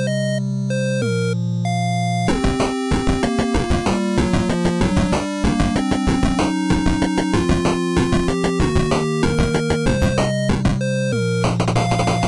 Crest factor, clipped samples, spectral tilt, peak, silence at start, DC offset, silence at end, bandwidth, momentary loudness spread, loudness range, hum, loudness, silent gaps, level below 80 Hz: 12 dB; under 0.1%; -6 dB/octave; -6 dBFS; 0 s; under 0.1%; 0 s; 12 kHz; 2 LU; 1 LU; none; -19 LUFS; none; -30 dBFS